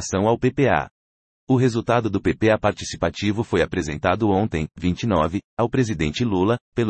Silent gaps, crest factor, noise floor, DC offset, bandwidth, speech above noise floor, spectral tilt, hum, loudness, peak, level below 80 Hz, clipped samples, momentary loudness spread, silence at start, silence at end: 0.91-1.47 s, 5.44-5.57 s, 6.61-6.72 s; 16 dB; under -90 dBFS; under 0.1%; 8.8 kHz; over 69 dB; -6 dB/octave; none; -21 LUFS; -4 dBFS; -44 dBFS; under 0.1%; 5 LU; 0 s; 0 s